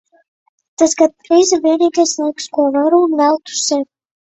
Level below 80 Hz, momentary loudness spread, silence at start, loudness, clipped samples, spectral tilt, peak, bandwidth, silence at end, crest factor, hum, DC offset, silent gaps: -62 dBFS; 7 LU; 0.8 s; -14 LUFS; under 0.1%; -1.5 dB/octave; 0 dBFS; 8.4 kHz; 0.5 s; 14 dB; none; under 0.1%; none